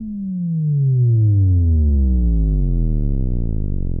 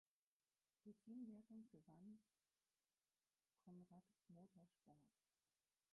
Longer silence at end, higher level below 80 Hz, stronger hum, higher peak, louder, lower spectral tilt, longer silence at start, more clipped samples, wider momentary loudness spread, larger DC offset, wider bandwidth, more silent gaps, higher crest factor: second, 0 s vs 0.85 s; first, -20 dBFS vs under -90 dBFS; neither; first, -8 dBFS vs -50 dBFS; first, -18 LUFS vs -64 LUFS; first, -16.5 dB/octave vs -7 dB/octave; second, 0 s vs 0.85 s; neither; about the same, 9 LU vs 10 LU; neither; second, 0.9 kHz vs 1.6 kHz; neither; second, 8 dB vs 18 dB